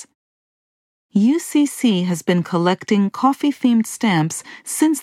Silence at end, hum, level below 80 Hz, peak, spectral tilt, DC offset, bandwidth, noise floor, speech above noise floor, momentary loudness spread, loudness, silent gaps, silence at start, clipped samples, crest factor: 0 s; none; -72 dBFS; -2 dBFS; -5 dB/octave; under 0.1%; 15.5 kHz; under -90 dBFS; over 72 dB; 4 LU; -18 LUFS; 0.15-1.09 s; 0 s; under 0.1%; 16 dB